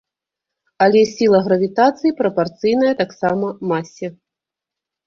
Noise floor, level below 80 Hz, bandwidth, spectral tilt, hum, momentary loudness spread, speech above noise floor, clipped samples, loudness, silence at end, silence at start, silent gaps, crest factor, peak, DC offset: -85 dBFS; -58 dBFS; 7.4 kHz; -6 dB/octave; none; 9 LU; 69 dB; under 0.1%; -17 LUFS; 0.95 s; 0.8 s; none; 16 dB; -2 dBFS; under 0.1%